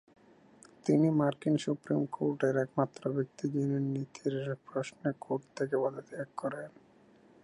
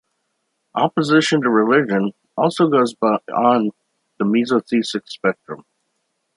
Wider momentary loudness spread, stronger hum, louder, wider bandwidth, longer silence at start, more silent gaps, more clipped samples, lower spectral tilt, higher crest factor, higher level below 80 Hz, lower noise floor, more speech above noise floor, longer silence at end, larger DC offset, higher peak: about the same, 10 LU vs 10 LU; neither; second, -33 LUFS vs -18 LUFS; about the same, 11 kHz vs 11 kHz; about the same, 0.85 s vs 0.75 s; neither; neither; first, -7.5 dB/octave vs -5.5 dB/octave; about the same, 20 dB vs 18 dB; second, -76 dBFS vs -70 dBFS; second, -61 dBFS vs -72 dBFS; second, 29 dB vs 55 dB; about the same, 0.75 s vs 0.8 s; neither; second, -14 dBFS vs -2 dBFS